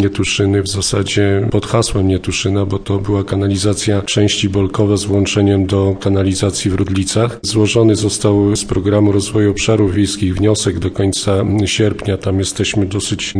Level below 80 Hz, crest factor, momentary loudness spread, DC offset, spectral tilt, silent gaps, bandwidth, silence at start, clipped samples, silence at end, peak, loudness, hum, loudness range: -36 dBFS; 12 dB; 4 LU; 0.2%; -5 dB/octave; none; 10.5 kHz; 0 s; under 0.1%; 0 s; -2 dBFS; -15 LUFS; none; 2 LU